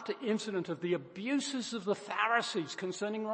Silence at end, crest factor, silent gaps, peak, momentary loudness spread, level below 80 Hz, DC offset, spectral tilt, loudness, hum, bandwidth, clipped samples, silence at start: 0 s; 20 dB; none; -16 dBFS; 7 LU; -82 dBFS; under 0.1%; -4 dB/octave; -34 LUFS; none; 8.8 kHz; under 0.1%; 0 s